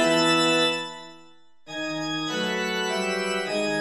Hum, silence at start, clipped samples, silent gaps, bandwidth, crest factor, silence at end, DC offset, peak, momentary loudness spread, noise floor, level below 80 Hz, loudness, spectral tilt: none; 0 s; under 0.1%; none; 13 kHz; 16 dB; 0 s; under 0.1%; -10 dBFS; 13 LU; -56 dBFS; -70 dBFS; -24 LUFS; -3 dB/octave